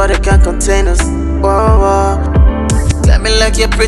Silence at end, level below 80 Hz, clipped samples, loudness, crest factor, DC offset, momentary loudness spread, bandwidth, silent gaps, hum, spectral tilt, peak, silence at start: 0 s; -12 dBFS; under 0.1%; -11 LUFS; 10 dB; under 0.1%; 4 LU; 12 kHz; none; none; -5 dB/octave; 0 dBFS; 0 s